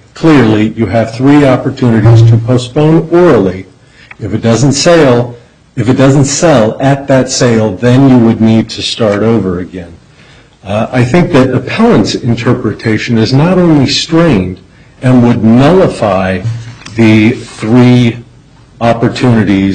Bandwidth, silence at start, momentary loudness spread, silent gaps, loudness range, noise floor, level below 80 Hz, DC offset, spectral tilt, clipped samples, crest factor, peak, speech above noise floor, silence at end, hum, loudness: 9.4 kHz; 0.15 s; 10 LU; none; 3 LU; -39 dBFS; -36 dBFS; under 0.1%; -6.5 dB/octave; under 0.1%; 8 dB; 0 dBFS; 32 dB; 0 s; none; -8 LUFS